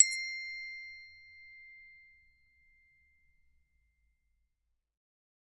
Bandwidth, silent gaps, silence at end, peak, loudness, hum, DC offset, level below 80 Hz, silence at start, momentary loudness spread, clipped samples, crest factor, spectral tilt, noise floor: 10 kHz; none; 3.55 s; -6 dBFS; -34 LUFS; none; under 0.1%; -76 dBFS; 0 s; 19 LU; under 0.1%; 34 dB; 6 dB/octave; -82 dBFS